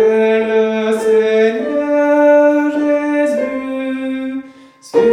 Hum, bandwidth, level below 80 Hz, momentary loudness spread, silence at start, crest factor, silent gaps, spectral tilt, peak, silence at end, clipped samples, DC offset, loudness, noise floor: none; 11 kHz; -60 dBFS; 11 LU; 0 s; 12 dB; none; -5.5 dB/octave; -2 dBFS; 0 s; under 0.1%; under 0.1%; -14 LUFS; -39 dBFS